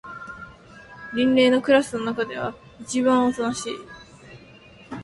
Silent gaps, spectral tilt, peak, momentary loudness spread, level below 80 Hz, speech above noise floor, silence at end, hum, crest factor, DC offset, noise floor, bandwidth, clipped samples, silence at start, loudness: none; -4 dB/octave; -6 dBFS; 23 LU; -58 dBFS; 27 dB; 0 s; none; 18 dB; under 0.1%; -48 dBFS; 11.5 kHz; under 0.1%; 0.05 s; -22 LUFS